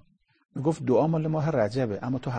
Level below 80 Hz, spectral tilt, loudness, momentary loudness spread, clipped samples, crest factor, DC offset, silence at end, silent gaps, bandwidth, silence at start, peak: -60 dBFS; -8.5 dB/octave; -26 LUFS; 7 LU; under 0.1%; 16 dB; under 0.1%; 0 s; none; 9.4 kHz; 0.55 s; -10 dBFS